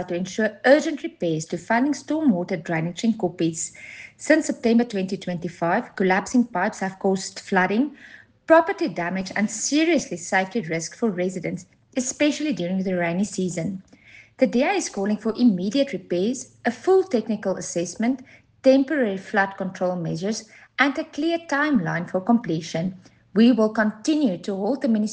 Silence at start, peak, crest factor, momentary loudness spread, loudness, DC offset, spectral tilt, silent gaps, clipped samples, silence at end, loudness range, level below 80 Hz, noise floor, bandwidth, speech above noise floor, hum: 0 s; -4 dBFS; 20 dB; 9 LU; -23 LUFS; under 0.1%; -5 dB/octave; none; under 0.1%; 0 s; 3 LU; -64 dBFS; -50 dBFS; 10 kHz; 27 dB; none